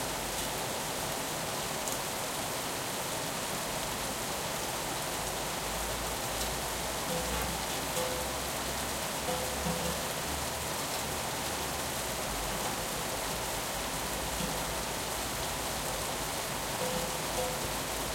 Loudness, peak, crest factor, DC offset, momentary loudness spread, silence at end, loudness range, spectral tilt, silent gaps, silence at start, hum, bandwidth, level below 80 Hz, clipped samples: -33 LUFS; -16 dBFS; 18 dB; under 0.1%; 1 LU; 0 s; 1 LU; -2.5 dB/octave; none; 0 s; none; 16.5 kHz; -48 dBFS; under 0.1%